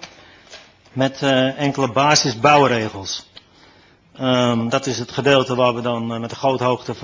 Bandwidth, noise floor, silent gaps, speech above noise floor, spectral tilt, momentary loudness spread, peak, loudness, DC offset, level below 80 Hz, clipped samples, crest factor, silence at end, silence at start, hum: 7.6 kHz; -51 dBFS; none; 33 dB; -4.5 dB/octave; 11 LU; 0 dBFS; -18 LUFS; under 0.1%; -54 dBFS; under 0.1%; 20 dB; 0 s; 0 s; none